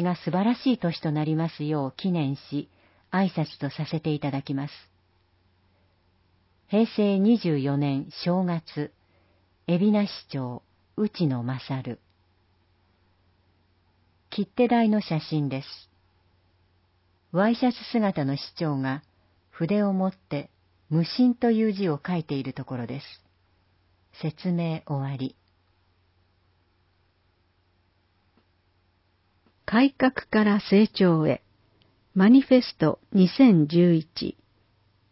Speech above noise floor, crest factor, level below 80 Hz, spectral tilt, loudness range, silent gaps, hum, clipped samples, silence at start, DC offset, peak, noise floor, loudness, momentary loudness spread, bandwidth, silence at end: 43 dB; 20 dB; -64 dBFS; -11 dB/octave; 12 LU; none; none; under 0.1%; 0 s; under 0.1%; -6 dBFS; -67 dBFS; -25 LUFS; 14 LU; 5.8 kHz; 0.8 s